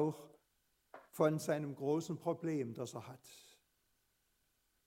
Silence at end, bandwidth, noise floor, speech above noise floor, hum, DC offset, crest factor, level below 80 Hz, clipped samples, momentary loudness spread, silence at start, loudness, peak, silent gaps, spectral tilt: 1.45 s; 16 kHz; -80 dBFS; 41 dB; none; under 0.1%; 22 dB; -84 dBFS; under 0.1%; 20 LU; 0 s; -39 LUFS; -18 dBFS; none; -6.5 dB/octave